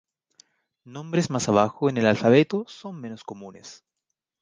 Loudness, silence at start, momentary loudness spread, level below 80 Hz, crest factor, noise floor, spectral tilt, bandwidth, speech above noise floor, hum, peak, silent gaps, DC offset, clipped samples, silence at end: -22 LUFS; 0.85 s; 23 LU; -62 dBFS; 22 dB; -83 dBFS; -6 dB/octave; 10 kHz; 59 dB; none; -4 dBFS; none; under 0.1%; under 0.1%; 0.7 s